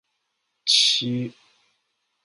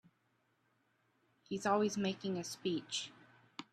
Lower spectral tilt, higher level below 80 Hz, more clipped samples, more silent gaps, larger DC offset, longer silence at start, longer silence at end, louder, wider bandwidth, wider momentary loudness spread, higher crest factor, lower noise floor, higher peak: second, -2 dB/octave vs -4.5 dB/octave; first, -74 dBFS vs -80 dBFS; neither; neither; neither; second, 0.65 s vs 1.5 s; first, 0.95 s vs 0.1 s; first, -19 LUFS vs -38 LUFS; second, 11.5 kHz vs 13.5 kHz; about the same, 14 LU vs 16 LU; about the same, 20 dB vs 20 dB; about the same, -76 dBFS vs -78 dBFS; first, -6 dBFS vs -20 dBFS